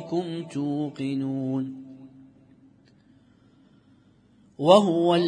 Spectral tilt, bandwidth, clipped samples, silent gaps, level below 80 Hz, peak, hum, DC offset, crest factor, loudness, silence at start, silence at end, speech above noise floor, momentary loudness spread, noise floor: -6.5 dB/octave; 10 kHz; under 0.1%; none; -74 dBFS; -2 dBFS; none; under 0.1%; 24 dB; -24 LUFS; 0 s; 0 s; 35 dB; 17 LU; -58 dBFS